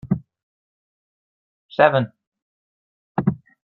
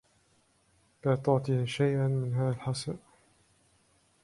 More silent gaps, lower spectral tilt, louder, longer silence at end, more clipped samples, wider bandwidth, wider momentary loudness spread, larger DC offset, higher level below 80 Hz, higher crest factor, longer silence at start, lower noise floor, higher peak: first, 0.43-1.69 s, 2.27-2.32 s, 2.42-3.15 s vs none; first, -9.5 dB/octave vs -7 dB/octave; first, -21 LUFS vs -30 LUFS; second, 0.35 s vs 1.25 s; neither; second, 5.6 kHz vs 11.5 kHz; first, 13 LU vs 8 LU; neither; first, -56 dBFS vs -64 dBFS; about the same, 24 dB vs 20 dB; second, 0.05 s vs 1.05 s; first, under -90 dBFS vs -68 dBFS; first, 0 dBFS vs -12 dBFS